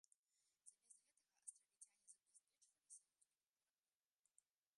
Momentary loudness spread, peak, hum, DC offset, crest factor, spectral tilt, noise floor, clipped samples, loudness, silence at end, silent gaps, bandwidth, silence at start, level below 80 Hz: 7 LU; -42 dBFS; none; under 0.1%; 32 dB; 3 dB/octave; under -90 dBFS; under 0.1%; -65 LUFS; 1.55 s; 0.18-0.23 s; 11.5 kHz; 0.1 s; under -90 dBFS